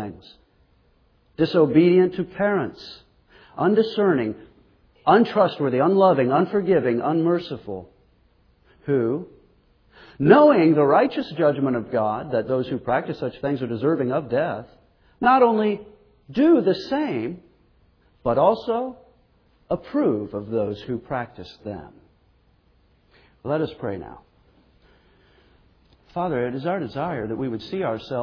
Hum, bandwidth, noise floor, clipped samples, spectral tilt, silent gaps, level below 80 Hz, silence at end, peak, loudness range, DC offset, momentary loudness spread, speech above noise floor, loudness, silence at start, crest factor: none; 5.4 kHz; -61 dBFS; under 0.1%; -9 dB/octave; none; -58 dBFS; 0 s; 0 dBFS; 13 LU; under 0.1%; 18 LU; 40 dB; -21 LUFS; 0 s; 22 dB